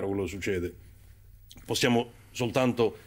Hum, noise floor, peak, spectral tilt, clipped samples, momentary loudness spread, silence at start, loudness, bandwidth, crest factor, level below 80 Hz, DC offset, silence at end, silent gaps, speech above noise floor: none; -53 dBFS; -12 dBFS; -5 dB/octave; under 0.1%; 13 LU; 0 s; -29 LUFS; 16 kHz; 18 dB; -56 dBFS; under 0.1%; 0.05 s; none; 24 dB